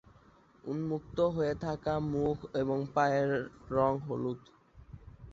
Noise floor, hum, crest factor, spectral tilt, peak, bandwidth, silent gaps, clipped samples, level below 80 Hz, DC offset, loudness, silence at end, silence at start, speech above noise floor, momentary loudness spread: -61 dBFS; none; 20 dB; -7.5 dB/octave; -14 dBFS; 7.6 kHz; none; under 0.1%; -56 dBFS; under 0.1%; -33 LUFS; 0 s; 0.65 s; 30 dB; 14 LU